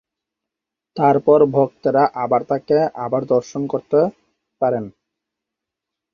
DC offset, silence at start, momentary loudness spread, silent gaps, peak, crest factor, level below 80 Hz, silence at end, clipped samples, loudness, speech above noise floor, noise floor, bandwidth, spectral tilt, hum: under 0.1%; 0.95 s; 10 LU; none; -2 dBFS; 18 dB; -62 dBFS; 1.25 s; under 0.1%; -18 LUFS; 67 dB; -84 dBFS; 6.8 kHz; -8 dB/octave; none